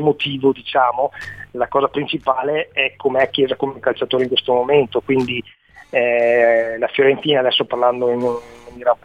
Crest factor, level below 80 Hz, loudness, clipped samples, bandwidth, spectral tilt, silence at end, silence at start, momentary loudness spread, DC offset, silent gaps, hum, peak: 16 dB; -56 dBFS; -18 LUFS; under 0.1%; 7.8 kHz; -6.5 dB/octave; 0.1 s; 0 s; 8 LU; 0.1%; none; none; -2 dBFS